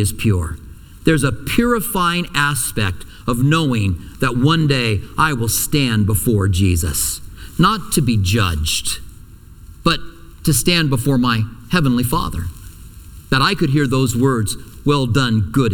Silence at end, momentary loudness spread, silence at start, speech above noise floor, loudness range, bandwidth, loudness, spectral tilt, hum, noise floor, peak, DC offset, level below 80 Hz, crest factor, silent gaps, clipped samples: 0 s; 8 LU; 0 s; 23 dB; 2 LU; 19 kHz; -17 LUFS; -4.5 dB/octave; none; -39 dBFS; 0 dBFS; under 0.1%; -32 dBFS; 16 dB; none; under 0.1%